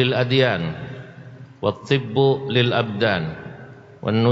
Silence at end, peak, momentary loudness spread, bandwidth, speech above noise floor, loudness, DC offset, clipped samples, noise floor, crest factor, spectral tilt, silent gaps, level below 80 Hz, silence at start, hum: 0 s; -4 dBFS; 21 LU; 7.8 kHz; 22 dB; -21 LUFS; under 0.1%; under 0.1%; -41 dBFS; 16 dB; -7.5 dB/octave; none; -56 dBFS; 0 s; none